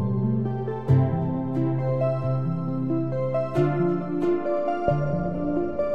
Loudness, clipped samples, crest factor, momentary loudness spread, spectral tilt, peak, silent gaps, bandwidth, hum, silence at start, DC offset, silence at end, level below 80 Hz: -25 LUFS; under 0.1%; 16 dB; 4 LU; -10.5 dB/octave; -8 dBFS; none; 5.6 kHz; none; 0 s; 1%; 0 s; -48 dBFS